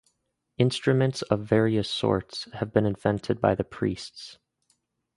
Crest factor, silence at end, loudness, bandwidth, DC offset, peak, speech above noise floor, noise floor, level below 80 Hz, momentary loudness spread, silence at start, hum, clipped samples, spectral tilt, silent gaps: 22 dB; 0.8 s; -26 LUFS; 11.5 kHz; under 0.1%; -4 dBFS; 51 dB; -76 dBFS; -54 dBFS; 13 LU; 0.6 s; none; under 0.1%; -6.5 dB/octave; none